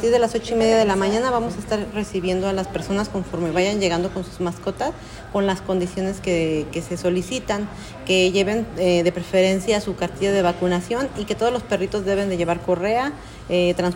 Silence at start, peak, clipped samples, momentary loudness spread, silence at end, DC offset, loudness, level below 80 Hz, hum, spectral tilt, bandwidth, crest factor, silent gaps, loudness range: 0 s; -6 dBFS; under 0.1%; 8 LU; 0 s; under 0.1%; -22 LUFS; -42 dBFS; none; -5 dB/octave; 16.5 kHz; 16 dB; none; 4 LU